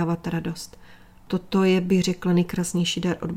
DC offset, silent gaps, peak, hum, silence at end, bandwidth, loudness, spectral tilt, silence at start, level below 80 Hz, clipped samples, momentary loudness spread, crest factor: under 0.1%; none; -10 dBFS; none; 0 s; 15.5 kHz; -23 LUFS; -5.5 dB/octave; 0 s; -50 dBFS; under 0.1%; 11 LU; 14 dB